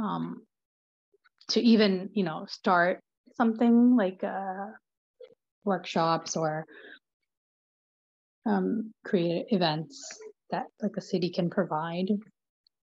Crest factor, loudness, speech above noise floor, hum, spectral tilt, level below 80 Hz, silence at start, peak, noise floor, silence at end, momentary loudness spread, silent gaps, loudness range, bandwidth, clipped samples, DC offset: 18 dB; -28 LUFS; over 63 dB; none; -5.5 dB/octave; -80 dBFS; 0 s; -10 dBFS; under -90 dBFS; 0.65 s; 17 LU; 0.65-1.12 s, 3.17-3.24 s, 4.97-5.14 s, 5.51-5.62 s, 7.13-7.20 s, 7.37-8.42 s; 8 LU; 7.6 kHz; under 0.1%; under 0.1%